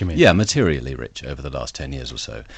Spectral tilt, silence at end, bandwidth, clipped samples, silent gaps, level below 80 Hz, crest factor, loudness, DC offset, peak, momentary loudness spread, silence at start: -5 dB/octave; 0 s; 9 kHz; under 0.1%; none; -36 dBFS; 20 dB; -21 LUFS; under 0.1%; 0 dBFS; 16 LU; 0 s